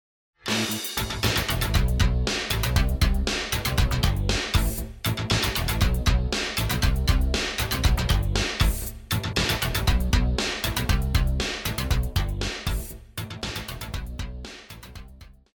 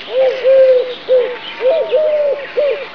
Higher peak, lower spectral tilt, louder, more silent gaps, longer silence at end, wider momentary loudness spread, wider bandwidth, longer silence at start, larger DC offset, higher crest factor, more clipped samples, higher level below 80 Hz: second, -6 dBFS vs -2 dBFS; about the same, -4 dB/octave vs -4 dB/octave; second, -25 LUFS vs -14 LUFS; neither; first, 0.25 s vs 0 s; first, 11 LU vs 7 LU; first, 19.5 kHz vs 5.4 kHz; first, 0.45 s vs 0 s; second, under 0.1% vs 0.7%; first, 18 dB vs 10 dB; neither; first, -28 dBFS vs -62 dBFS